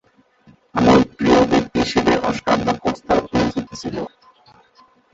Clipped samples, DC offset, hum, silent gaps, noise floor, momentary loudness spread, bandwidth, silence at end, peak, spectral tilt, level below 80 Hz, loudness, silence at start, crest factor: under 0.1%; under 0.1%; none; none; -54 dBFS; 13 LU; 8 kHz; 1.05 s; -2 dBFS; -5.5 dB/octave; -42 dBFS; -18 LUFS; 0.75 s; 18 dB